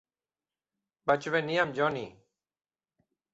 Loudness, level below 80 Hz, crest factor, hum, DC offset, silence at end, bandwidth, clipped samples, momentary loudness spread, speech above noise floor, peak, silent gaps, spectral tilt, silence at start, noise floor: -29 LUFS; -72 dBFS; 22 dB; none; under 0.1%; 1.2 s; 8.2 kHz; under 0.1%; 11 LU; over 61 dB; -12 dBFS; none; -5.5 dB/octave; 1.05 s; under -90 dBFS